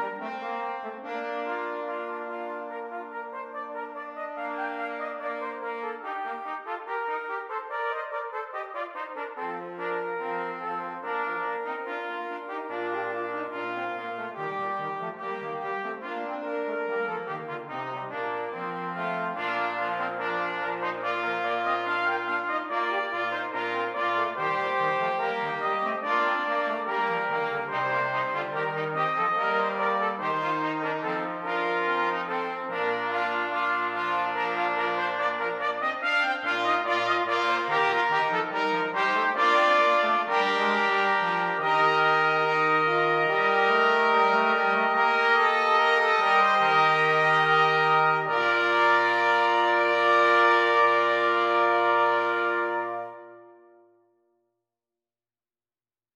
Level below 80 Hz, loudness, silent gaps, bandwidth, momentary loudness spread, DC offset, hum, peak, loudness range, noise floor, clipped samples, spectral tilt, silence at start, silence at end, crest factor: -84 dBFS; -26 LUFS; none; 12 kHz; 13 LU; under 0.1%; none; -8 dBFS; 12 LU; under -90 dBFS; under 0.1%; -4.5 dB/octave; 0 s; 2.65 s; 18 dB